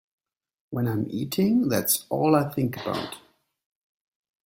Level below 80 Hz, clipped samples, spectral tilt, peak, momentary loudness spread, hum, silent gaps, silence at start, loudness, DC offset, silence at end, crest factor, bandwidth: -62 dBFS; under 0.1%; -5 dB/octave; -6 dBFS; 11 LU; none; none; 0.7 s; -25 LUFS; under 0.1%; 1.25 s; 20 dB; 16.5 kHz